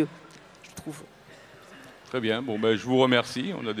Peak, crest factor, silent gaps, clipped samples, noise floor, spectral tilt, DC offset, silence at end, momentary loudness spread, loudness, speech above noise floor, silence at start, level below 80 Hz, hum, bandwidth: -6 dBFS; 22 dB; none; under 0.1%; -50 dBFS; -5 dB/octave; under 0.1%; 0 s; 26 LU; -26 LUFS; 25 dB; 0 s; -66 dBFS; none; 15 kHz